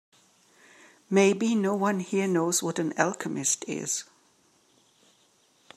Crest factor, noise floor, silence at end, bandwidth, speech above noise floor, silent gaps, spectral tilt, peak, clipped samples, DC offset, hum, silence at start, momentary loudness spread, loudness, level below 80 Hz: 24 dB; -64 dBFS; 1.75 s; 14.5 kHz; 38 dB; none; -4 dB/octave; -6 dBFS; under 0.1%; under 0.1%; none; 1.1 s; 7 LU; -26 LUFS; -80 dBFS